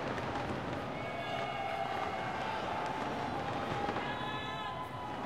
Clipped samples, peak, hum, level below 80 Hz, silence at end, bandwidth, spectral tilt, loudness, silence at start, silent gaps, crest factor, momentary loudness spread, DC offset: under 0.1%; -22 dBFS; none; -60 dBFS; 0 s; 16 kHz; -5.5 dB/octave; -37 LUFS; 0 s; none; 16 dB; 3 LU; 0.1%